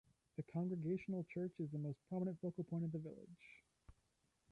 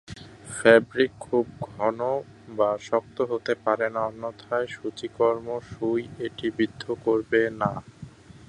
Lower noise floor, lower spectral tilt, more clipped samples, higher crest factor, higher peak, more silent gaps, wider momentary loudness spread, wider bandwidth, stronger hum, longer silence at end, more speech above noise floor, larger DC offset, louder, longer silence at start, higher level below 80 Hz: first, -82 dBFS vs -45 dBFS; first, -10.5 dB/octave vs -5.5 dB/octave; neither; second, 14 dB vs 24 dB; second, -32 dBFS vs -2 dBFS; neither; first, 16 LU vs 12 LU; second, 4.8 kHz vs 11.5 kHz; neither; first, 0.6 s vs 0.15 s; first, 38 dB vs 20 dB; neither; second, -46 LUFS vs -26 LUFS; first, 0.4 s vs 0.1 s; second, -78 dBFS vs -58 dBFS